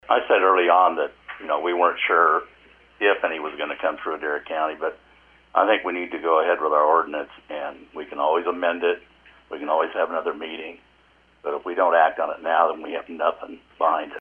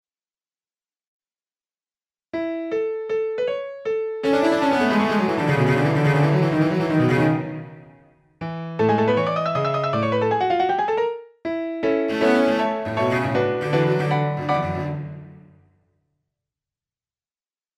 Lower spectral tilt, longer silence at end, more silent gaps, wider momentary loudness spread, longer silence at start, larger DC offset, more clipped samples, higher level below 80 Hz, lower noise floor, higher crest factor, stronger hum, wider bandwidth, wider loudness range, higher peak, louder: second, -5.5 dB/octave vs -7.5 dB/octave; second, 0 s vs 2.45 s; neither; first, 15 LU vs 11 LU; second, 0.1 s vs 2.35 s; neither; neither; second, -64 dBFS vs -58 dBFS; second, -58 dBFS vs under -90 dBFS; about the same, 20 dB vs 18 dB; neither; second, 3.9 kHz vs 12.5 kHz; second, 5 LU vs 9 LU; about the same, -2 dBFS vs -4 dBFS; about the same, -22 LUFS vs -21 LUFS